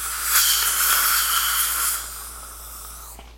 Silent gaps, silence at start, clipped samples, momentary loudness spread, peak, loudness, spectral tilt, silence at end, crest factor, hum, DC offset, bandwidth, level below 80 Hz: none; 0 s; under 0.1%; 19 LU; -2 dBFS; -18 LUFS; 2 dB/octave; 0 s; 22 dB; 60 Hz at -60 dBFS; under 0.1%; 16.5 kHz; -44 dBFS